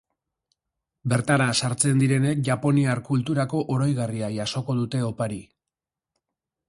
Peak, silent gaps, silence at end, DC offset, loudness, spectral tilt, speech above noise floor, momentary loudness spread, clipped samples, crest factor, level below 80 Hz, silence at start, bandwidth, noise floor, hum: -6 dBFS; none; 1.25 s; under 0.1%; -24 LUFS; -5.5 dB/octave; 65 dB; 7 LU; under 0.1%; 18 dB; -58 dBFS; 1.05 s; 11.5 kHz; -88 dBFS; none